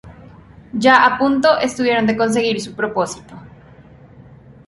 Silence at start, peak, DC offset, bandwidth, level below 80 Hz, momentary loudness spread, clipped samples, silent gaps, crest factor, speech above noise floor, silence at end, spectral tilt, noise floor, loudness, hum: 0.05 s; 0 dBFS; under 0.1%; 11.5 kHz; -52 dBFS; 12 LU; under 0.1%; none; 18 dB; 27 dB; 0.35 s; -4.5 dB/octave; -43 dBFS; -16 LUFS; none